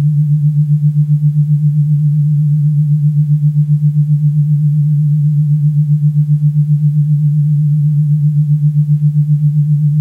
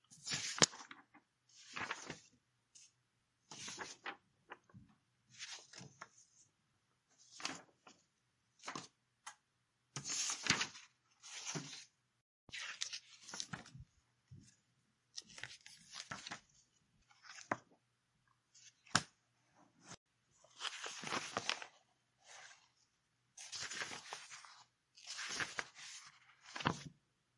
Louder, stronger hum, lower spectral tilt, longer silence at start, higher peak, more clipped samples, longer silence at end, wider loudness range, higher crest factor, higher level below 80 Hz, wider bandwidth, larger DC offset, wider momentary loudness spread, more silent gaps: first, -12 LUFS vs -43 LUFS; neither; first, -12 dB/octave vs -1.5 dB/octave; about the same, 0 s vs 0.1 s; about the same, -4 dBFS vs -6 dBFS; neither; second, 0 s vs 0.45 s; second, 0 LU vs 11 LU; second, 6 dB vs 42 dB; first, -52 dBFS vs -80 dBFS; second, 0.5 kHz vs 11.5 kHz; neither; second, 0 LU vs 24 LU; second, none vs 12.21-12.47 s, 19.97-20.06 s